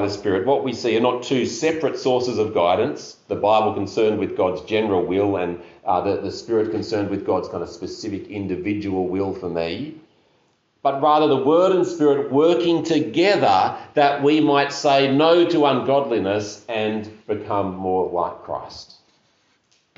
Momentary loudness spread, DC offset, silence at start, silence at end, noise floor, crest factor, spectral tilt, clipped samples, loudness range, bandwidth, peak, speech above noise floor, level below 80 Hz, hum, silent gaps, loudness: 12 LU; under 0.1%; 0 s; 1.15 s; -63 dBFS; 16 dB; -4 dB/octave; under 0.1%; 8 LU; 7.8 kHz; -4 dBFS; 43 dB; -60 dBFS; none; none; -20 LUFS